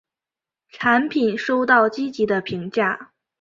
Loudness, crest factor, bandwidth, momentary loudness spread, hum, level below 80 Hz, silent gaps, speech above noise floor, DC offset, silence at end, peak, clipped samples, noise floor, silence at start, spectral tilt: -20 LUFS; 20 dB; 7.6 kHz; 7 LU; none; -62 dBFS; none; 70 dB; under 0.1%; 0.35 s; -2 dBFS; under 0.1%; -89 dBFS; 0.75 s; -6 dB/octave